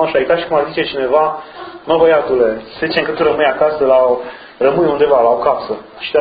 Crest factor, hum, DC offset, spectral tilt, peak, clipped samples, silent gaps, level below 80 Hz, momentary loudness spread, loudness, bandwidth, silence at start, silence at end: 14 dB; none; under 0.1%; -8.5 dB/octave; 0 dBFS; under 0.1%; none; -48 dBFS; 10 LU; -14 LUFS; 5 kHz; 0 s; 0 s